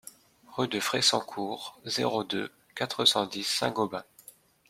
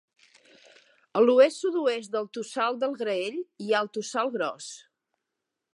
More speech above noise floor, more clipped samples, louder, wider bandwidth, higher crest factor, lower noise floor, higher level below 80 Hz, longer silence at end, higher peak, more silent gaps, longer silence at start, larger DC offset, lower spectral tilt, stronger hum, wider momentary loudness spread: second, 26 dB vs 59 dB; neither; about the same, -28 LUFS vs -26 LUFS; first, 16.5 kHz vs 11.5 kHz; about the same, 22 dB vs 20 dB; second, -55 dBFS vs -85 dBFS; first, -72 dBFS vs -86 dBFS; second, 0.65 s vs 1 s; about the same, -8 dBFS vs -8 dBFS; neither; second, 0.05 s vs 1.15 s; neither; about the same, -2.5 dB/octave vs -3.5 dB/octave; neither; about the same, 13 LU vs 13 LU